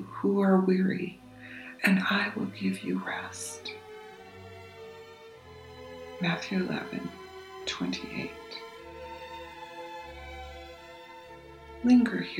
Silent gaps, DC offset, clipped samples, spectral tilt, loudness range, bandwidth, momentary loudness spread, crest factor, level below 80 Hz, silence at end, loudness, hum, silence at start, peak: none; under 0.1%; under 0.1%; -5.5 dB/octave; 13 LU; 14.5 kHz; 24 LU; 20 dB; -58 dBFS; 0 s; -29 LUFS; none; 0 s; -10 dBFS